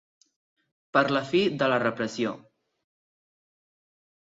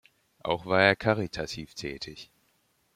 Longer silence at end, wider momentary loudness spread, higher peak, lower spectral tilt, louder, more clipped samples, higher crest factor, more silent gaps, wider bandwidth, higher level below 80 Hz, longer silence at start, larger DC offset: first, 1.85 s vs 0.7 s; second, 8 LU vs 17 LU; about the same, -8 dBFS vs -6 dBFS; about the same, -5.5 dB/octave vs -5 dB/octave; about the same, -26 LUFS vs -28 LUFS; neither; about the same, 22 dB vs 24 dB; neither; second, 7.8 kHz vs 15 kHz; second, -72 dBFS vs -58 dBFS; first, 0.95 s vs 0.45 s; neither